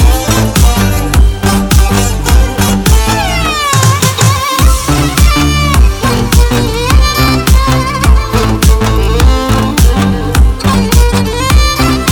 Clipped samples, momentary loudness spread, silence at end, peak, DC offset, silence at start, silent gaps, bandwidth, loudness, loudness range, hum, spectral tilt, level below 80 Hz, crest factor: 1%; 3 LU; 0 s; 0 dBFS; under 0.1%; 0 s; none; 20 kHz; -9 LUFS; 1 LU; none; -4.5 dB/octave; -10 dBFS; 8 dB